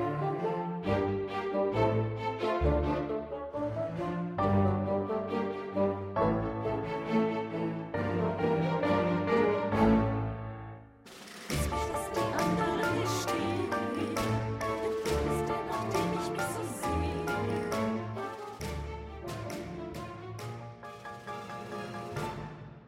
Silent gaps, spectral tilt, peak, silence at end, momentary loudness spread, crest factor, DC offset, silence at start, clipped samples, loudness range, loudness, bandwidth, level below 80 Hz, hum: none; -6.5 dB/octave; -14 dBFS; 0 s; 13 LU; 18 dB; under 0.1%; 0 s; under 0.1%; 9 LU; -32 LUFS; 16 kHz; -46 dBFS; none